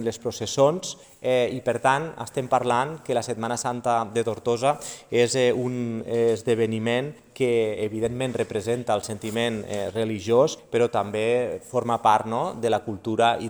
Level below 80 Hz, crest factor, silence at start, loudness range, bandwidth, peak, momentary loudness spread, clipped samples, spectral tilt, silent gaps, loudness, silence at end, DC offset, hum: -62 dBFS; 20 dB; 0 s; 2 LU; over 20 kHz; -4 dBFS; 7 LU; under 0.1%; -5 dB/octave; none; -24 LUFS; 0 s; under 0.1%; none